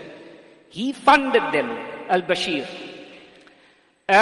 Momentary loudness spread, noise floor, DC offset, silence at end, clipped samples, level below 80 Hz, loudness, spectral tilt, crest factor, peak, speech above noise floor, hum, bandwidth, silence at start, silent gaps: 22 LU; -57 dBFS; under 0.1%; 0 s; under 0.1%; -60 dBFS; -21 LUFS; -4 dB/octave; 20 dB; -4 dBFS; 36 dB; none; 11.5 kHz; 0 s; none